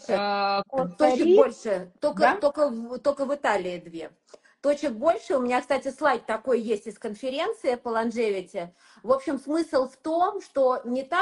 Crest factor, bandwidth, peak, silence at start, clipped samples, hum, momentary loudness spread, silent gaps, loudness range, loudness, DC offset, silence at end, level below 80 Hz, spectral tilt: 20 dB; 11.5 kHz; -4 dBFS; 0.05 s; under 0.1%; none; 11 LU; none; 4 LU; -25 LUFS; under 0.1%; 0 s; -66 dBFS; -5 dB/octave